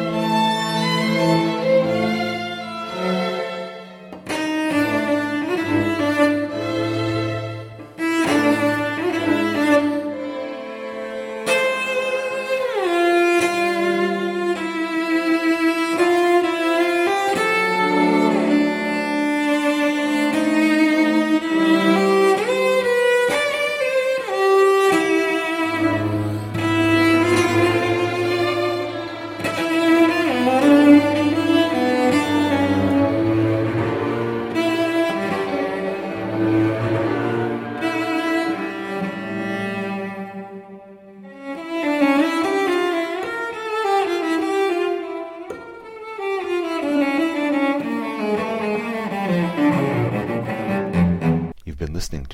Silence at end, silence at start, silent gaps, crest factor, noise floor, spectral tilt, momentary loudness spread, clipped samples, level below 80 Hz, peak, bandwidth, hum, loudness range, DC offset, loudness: 0 s; 0 s; none; 18 dB; -41 dBFS; -5.5 dB/octave; 11 LU; under 0.1%; -48 dBFS; -2 dBFS; 16 kHz; none; 6 LU; under 0.1%; -19 LUFS